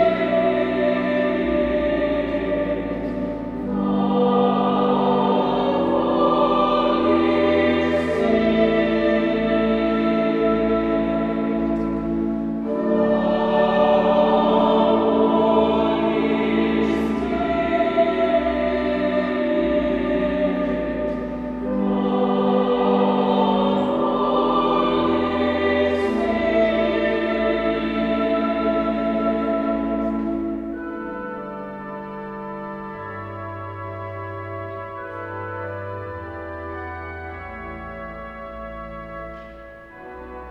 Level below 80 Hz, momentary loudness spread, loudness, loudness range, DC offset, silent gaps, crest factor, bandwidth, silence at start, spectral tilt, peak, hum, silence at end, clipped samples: -42 dBFS; 14 LU; -20 LUFS; 13 LU; under 0.1%; none; 16 dB; 7.6 kHz; 0 s; -8 dB/octave; -6 dBFS; none; 0 s; under 0.1%